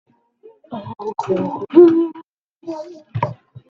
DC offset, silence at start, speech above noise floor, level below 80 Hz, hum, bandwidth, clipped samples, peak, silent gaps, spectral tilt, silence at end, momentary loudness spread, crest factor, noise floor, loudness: under 0.1%; 0.7 s; 29 dB; -64 dBFS; none; 6.2 kHz; under 0.1%; 0 dBFS; 2.28-2.60 s; -9 dB/octave; 0.35 s; 21 LU; 18 dB; -49 dBFS; -17 LUFS